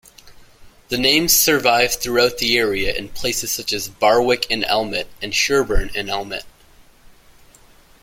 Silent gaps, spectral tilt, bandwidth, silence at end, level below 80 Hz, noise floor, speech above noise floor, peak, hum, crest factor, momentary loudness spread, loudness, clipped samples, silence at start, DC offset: none; -2 dB/octave; 16.5 kHz; 1.55 s; -34 dBFS; -49 dBFS; 31 dB; -2 dBFS; none; 18 dB; 11 LU; -18 LUFS; under 0.1%; 0.25 s; under 0.1%